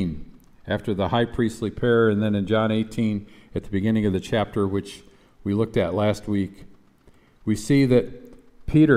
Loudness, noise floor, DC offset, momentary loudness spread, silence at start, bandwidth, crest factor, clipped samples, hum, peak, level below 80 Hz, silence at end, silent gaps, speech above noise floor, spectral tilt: -23 LUFS; -55 dBFS; under 0.1%; 15 LU; 0 s; 14 kHz; 18 dB; under 0.1%; none; -4 dBFS; -46 dBFS; 0 s; none; 32 dB; -7 dB/octave